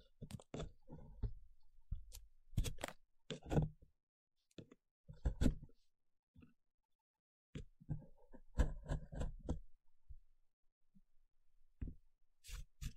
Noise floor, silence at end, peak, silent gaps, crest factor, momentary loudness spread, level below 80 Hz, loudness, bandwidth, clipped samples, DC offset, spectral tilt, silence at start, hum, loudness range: -62 dBFS; 0 s; -20 dBFS; 4.03-4.27 s, 4.91-5.04 s, 6.19-6.34 s, 6.74-6.78 s, 6.85-6.89 s, 6.95-7.53 s, 10.53-10.63 s, 10.72-10.81 s; 28 dB; 24 LU; -50 dBFS; -47 LUFS; 15 kHz; under 0.1%; under 0.1%; -6.5 dB/octave; 0.2 s; none; 9 LU